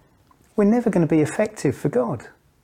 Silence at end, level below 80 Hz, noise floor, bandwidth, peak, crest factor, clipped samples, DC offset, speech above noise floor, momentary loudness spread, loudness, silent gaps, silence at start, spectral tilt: 0.35 s; -58 dBFS; -57 dBFS; 15 kHz; -6 dBFS; 16 dB; under 0.1%; under 0.1%; 37 dB; 9 LU; -21 LUFS; none; 0.55 s; -7.5 dB/octave